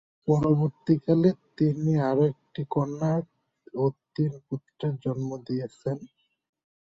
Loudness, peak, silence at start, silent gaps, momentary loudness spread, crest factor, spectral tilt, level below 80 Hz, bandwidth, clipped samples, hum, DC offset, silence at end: -27 LUFS; -8 dBFS; 0.25 s; none; 11 LU; 18 dB; -9.5 dB/octave; -62 dBFS; 7.8 kHz; under 0.1%; none; under 0.1%; 0.85 s